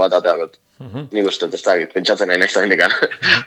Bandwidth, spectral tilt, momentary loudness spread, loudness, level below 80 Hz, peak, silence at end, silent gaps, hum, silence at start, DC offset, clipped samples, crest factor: 13 kHz; -3.5 dB/octave; 11 LU; -16 LUFS; -64 dBFS; 0 dBFS; 0 s; none; none; 0 s; under 0.1%; under 0.1%; 16 dB